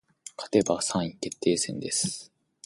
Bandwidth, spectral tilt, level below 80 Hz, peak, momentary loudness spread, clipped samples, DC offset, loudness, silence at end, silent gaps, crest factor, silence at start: 11.5 kHz; -3.5 dB/octave; -62 dBFS; -8 dBFS; 14 LU; under 0.1%; under 0.1%; -27 LUFS; 0.4 s; none; 22 dB; 0.25 s